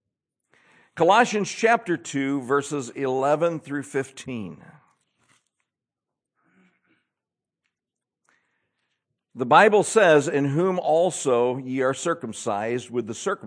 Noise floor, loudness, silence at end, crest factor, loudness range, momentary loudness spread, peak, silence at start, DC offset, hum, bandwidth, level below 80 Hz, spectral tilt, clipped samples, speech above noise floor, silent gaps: -88 dBFS; -22 LUFS; 0 s; 22 dB; 16 LU; 14 LU; -2 dBFS; 0.95 s; under 0.1%; none; 10.5 kHz; -78 dBFS; -4.5 dB/octave; under 0.1%; 66 dB; none